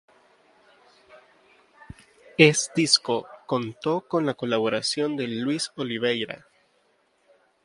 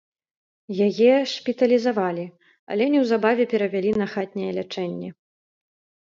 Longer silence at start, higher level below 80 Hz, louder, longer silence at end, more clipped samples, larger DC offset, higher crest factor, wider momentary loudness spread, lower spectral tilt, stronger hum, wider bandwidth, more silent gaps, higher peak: first, 1.15 s vs 0.7 s; about the same, -66 dBFS vs -66 dBFS; about the same, -24 LUFS vs -22 LUFS; first, 1.3 s vs 0.9 s; neither; neither; first, 26 dB vs 18 dB; about the same, 12 LU vs 13 LU; second, -3.5 dB/octave vs -6.5 dB/octave; neither; first, 11.5 kHz vs 7.6 kHz; second, none vs 2.59-2.67 s; first, 0 dBFS vs -4 dBFS